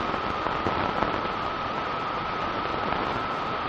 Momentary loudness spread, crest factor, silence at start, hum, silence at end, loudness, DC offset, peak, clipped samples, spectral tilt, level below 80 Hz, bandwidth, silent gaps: 3 LU; 24 dB; 0 s; none; 0 s; -28 LUFS; under 0.1%; -4 dBFS; under 0.1%; -6 dB/octave; -48 dBFS; 8.4 kHz; none